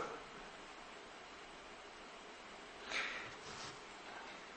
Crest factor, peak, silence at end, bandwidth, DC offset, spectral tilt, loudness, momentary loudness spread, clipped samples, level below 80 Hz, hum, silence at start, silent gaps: 22 dB; -28 dBFS; 0 s; 8.4 kHz; under 0.1%; -2 dB/octave; -49 LUFS; 12 LU; under 0.1%; -72 dBFS; none; 0 s; none